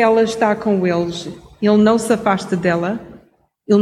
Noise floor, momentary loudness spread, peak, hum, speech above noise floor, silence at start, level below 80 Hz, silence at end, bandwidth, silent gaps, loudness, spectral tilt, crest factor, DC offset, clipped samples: -54 dBFS; 11 LU; -2 dBFS; none; 38 dB; 0 s; -52 dBFS; 0 s; 13 kHz; none; -17 LUFS; -6 dB/octave; 16 dB; under 0.1%; under 0.1%